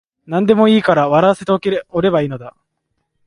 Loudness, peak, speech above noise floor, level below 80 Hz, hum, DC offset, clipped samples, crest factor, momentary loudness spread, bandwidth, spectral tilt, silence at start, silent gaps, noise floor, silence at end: -14 LUFS; 0 dBFS; 57 dB; -54 dBFS; none; under 0.1%; under 0.1%; 16 dB; 10 LU; 10.5 kHz; -7 dB/octave; 0.3 s; none; -71 dBFS; 0.75 s